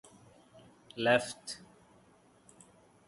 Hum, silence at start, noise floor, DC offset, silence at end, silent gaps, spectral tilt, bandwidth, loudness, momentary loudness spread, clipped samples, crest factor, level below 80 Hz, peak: none; 0.95 s; -64 dBFS; under 0.1%; 1.5 s; none; -3.5 dB/octave; 11.5 kHz; -32 LUFS; 19 LU; under 0.1%; 26 dB; -74 dBFS; -12 dBFS